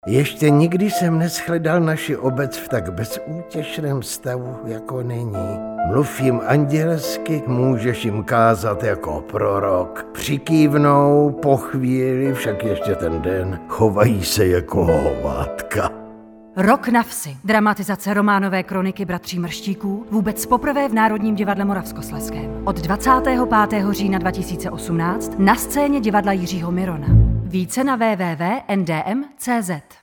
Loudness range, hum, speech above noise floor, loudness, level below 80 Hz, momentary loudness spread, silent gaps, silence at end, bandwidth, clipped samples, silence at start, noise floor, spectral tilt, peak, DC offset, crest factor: 4 LU; none; 22 dB; -19 LUFS; -36 dBFS; 10 LU; none; 0.2 s; over 20 kHz; under 0.1%; 0.05 s; -41 dBFS; -6 dB/octave; 0 dBFS; under 0.1%; 18 dB